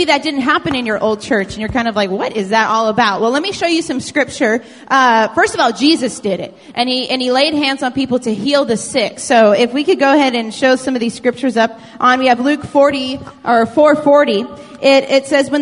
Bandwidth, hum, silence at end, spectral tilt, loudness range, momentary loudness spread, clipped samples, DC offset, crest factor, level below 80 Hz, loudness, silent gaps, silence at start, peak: 11 kHz; none; 0 s; -4 dB/octave; 2 LU; 7 LU; under 0.1%; under 0.1%; 14 dB; -48 dBFS; -14 LUFS; none; 0 s; 0 dBFS